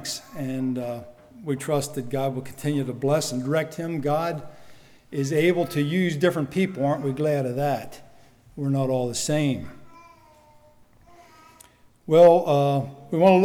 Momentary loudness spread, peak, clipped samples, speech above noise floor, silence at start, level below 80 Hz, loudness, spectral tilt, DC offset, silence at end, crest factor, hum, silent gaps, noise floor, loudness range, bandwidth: 12 LU; -6 dBFS; under 0.1%; 32 dB; 0 s; -60 dBFS; -24 LUFS; -6 dB/octave; under 0.1%; 0 s; 18 dB; none; none; -54 dBFS; 6 LU; 18 kHz